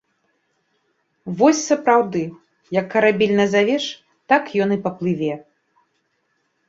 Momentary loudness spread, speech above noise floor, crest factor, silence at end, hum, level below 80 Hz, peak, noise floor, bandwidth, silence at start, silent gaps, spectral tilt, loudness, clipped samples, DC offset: 14 LU; 51 dB; 18 dB; 1.25 s; none; -64 dBFS; -2 dBFS; -69 dBFS; 7.8 kHz; 1.25 s; none; -5 dB/octave; -19 LUFS; under 0.1%; under 0.1%